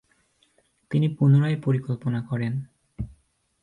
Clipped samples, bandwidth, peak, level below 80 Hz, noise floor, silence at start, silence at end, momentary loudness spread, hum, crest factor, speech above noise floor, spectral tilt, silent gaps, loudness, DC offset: under 0.1%; 4.4 kHz; -10 dBFS; -52 dBFS; -65 dBFS; 0.9 s; 0.55 s; 18 LU; none; 16 dB; 43 dB; -9.5 dB/octave; none; -24 LUFS; under 0.1%